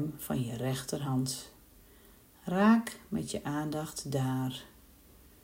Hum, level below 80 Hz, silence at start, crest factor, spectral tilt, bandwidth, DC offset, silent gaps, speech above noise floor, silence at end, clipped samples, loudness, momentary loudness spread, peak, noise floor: none; -60 dBFS; 0 s; 18 dB; -5.5 dB/octave; 16 kHz; under 0.1%; none; 27 dB; 0.75 s; under 0.1%; -32 LUFS; 13 LU; -14 dBFS; -58 dBFS